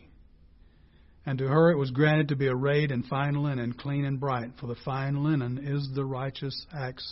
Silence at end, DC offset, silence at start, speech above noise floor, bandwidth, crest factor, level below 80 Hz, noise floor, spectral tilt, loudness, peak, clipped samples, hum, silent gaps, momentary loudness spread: 0 s; under 0.1%; 1.25 s; 29 dB; 5.8 kHz; 18 dB; -58 dBFS; -57 dBFS; -11 dB/octave; -28 LUFS; -10 dBFS; under 0.1%; none; none; 12 LU